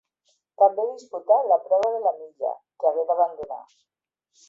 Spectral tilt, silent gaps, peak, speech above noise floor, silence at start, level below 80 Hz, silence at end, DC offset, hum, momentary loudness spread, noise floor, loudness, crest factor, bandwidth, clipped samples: -4.5 dB/octave; none; -6 dBFS; 48 dB; 0.6 s; -74 dBFS; 0.9 s; under 0.1%; none; 14 LU; -71 dBFS; -23 LUFS; 18 dB; 7.6 kHz; under 0.1%